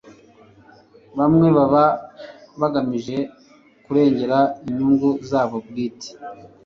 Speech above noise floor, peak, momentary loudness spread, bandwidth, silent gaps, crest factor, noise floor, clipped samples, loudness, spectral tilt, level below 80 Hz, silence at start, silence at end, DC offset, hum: 33 dB; -4 dBFS; 20 LU; 7.2 kHz; none; 18 dB; -52 dBFS; under 0.1%; -19 LUFS; -8 dB/octave; -56 dBFS; 0.05 s; 0.2 s; under 0.1%; none